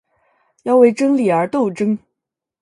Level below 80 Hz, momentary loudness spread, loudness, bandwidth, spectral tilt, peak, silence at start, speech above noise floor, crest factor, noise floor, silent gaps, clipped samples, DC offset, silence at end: -66 dBFS; 10 LU; -16 LUFS; 11 kHz; -7 dB/octave; 0 dBFS; 0.65 s; 67 dB; 16 dB; -82 dBFS; none; under 0.1%; under 0.1%; 0.65 s